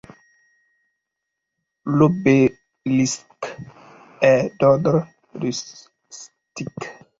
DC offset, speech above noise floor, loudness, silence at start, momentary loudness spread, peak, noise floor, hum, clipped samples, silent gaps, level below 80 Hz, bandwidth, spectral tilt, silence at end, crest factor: under 0.1%; 62 dB; -19 LUFS; 1.85 s; 23 LU; -2 dBFS; -81 dBFS; none; under 0.1%; none; -58 dBFS; 7.8 kHz; -6 dB/octave; 0.3 s; 20 dB